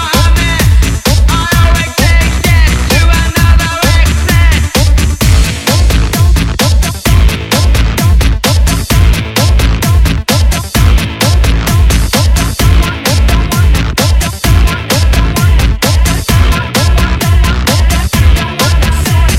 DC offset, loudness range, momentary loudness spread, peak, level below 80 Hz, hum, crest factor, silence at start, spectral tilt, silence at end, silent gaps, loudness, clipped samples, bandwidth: 0.4%; 1 LU; 2 LU; 0 dBFS; -10 dBFS; none; 8 dB; 0 s; -4.5 dB/octave; 0 s; none; -9 LUFS; 0.4%; 16.5 kHz